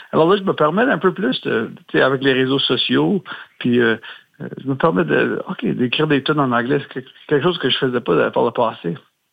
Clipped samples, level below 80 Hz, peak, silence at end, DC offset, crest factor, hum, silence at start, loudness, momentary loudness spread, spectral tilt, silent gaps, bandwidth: under 0.1%; -60 dBFS; -2 dBFS; 0.35 s; under 0.1%; 16 dB; none; 0 s; -18 LUFS; 12 LU; -8 dB/octave; none; 8.2 kHz